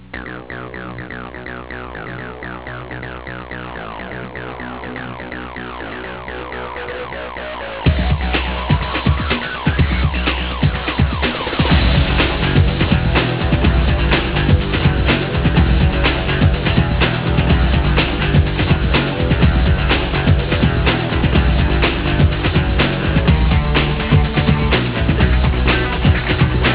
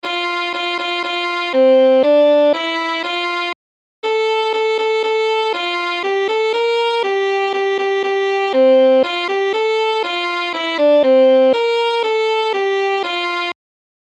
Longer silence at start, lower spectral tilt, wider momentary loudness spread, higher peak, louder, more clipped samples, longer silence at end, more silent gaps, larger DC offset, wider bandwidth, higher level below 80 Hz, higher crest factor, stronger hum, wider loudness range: about the same, 0 s vs 0.05 s; first, -10.5 dB/octave vs -2 dB/octave; first, 14 LU vs 8 LU; about the same, -2 dBFS vs -4 dBFS; about the same, -16 LUFS vs -16 LUFS; neither; second, 0 s vs 0.5 s; second, none vs 3.55-4.02 s; first, 0.4% vs under 0.1%; second, 4 kHz vs 8.8 kHz; first, -20 dBFS vs -78 dBFS; about the same, 14 dB vs 12 dB; neither; first, 13 LU vs 3 LU